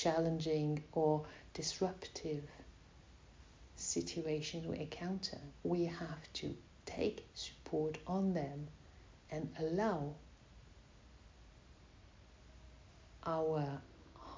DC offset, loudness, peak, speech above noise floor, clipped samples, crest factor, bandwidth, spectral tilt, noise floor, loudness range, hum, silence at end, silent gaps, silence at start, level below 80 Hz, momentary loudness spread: under 0.1%; -40 LUFS; -22 dBFS; 22 dB; under 0.1%; 20 dB; 7.6 kHz; -5.5 dB/octave; -61 dBFS; 5 LU; none; 0 s; none; 0 s; -62 dBFS; 25 LU